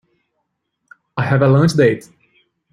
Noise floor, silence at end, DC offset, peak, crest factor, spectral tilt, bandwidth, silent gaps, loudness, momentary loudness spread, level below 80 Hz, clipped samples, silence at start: -72 dBFS; 0.75 s; under 0.1%; -2 dBFS; 16 dB; -7.5 dB/octave; 12 kHz; none; -15 LUFS; 14 LU; -52 dBFS; under 0.1%; 1.15 s